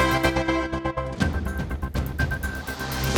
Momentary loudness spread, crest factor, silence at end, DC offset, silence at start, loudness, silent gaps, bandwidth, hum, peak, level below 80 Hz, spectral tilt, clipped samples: 8 LU; 18 dB; 0 s; under 0.1%; 0 s; -26 LUFS; none; 20 kHz; none; -8 dBFS; -32 dBFS; -5.5 dB/octave; under 0.1%